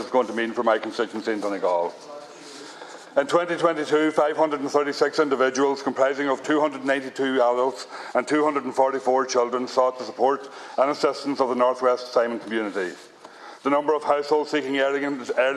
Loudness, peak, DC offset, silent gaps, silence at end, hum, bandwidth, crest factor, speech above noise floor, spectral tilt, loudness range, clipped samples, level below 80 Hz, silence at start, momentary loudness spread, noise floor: -23 LUFS; -6 dBFS; under 0.1%; none; 0 s; none; 12 kHz; 18 dB; 21 dB; -4 dB/octave; 3 LU; under 0.1%; -78 dBFS; 0 s; 10 LU; -44 dBFS